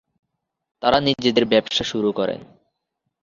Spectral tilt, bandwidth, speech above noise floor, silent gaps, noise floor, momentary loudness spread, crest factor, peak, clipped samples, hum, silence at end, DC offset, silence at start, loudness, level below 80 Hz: -4.5 dB/octave; 7.6 kHz; 58 dB; none; -78 dBFS; 8 LU; 20 dB; -2 dBFS; under 0.1%; none; 0.8 s; under 0.1%; 0.8 s; -20 LUFS; -54 dBFS